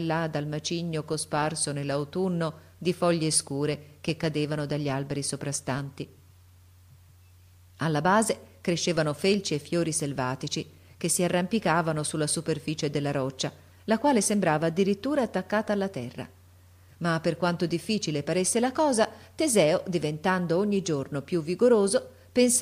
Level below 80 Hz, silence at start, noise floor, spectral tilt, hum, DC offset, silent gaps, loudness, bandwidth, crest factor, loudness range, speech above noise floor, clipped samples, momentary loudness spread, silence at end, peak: -62 dBFS; 0 s; -55 dBFS; -4.5 dB/octave; none; under 0.1%; none; -27 LUFS; 15.5 kHz; 18 dB; 5 LU; 28 dB; under 0.1%; 10 LU; 0 s; -10 dBFS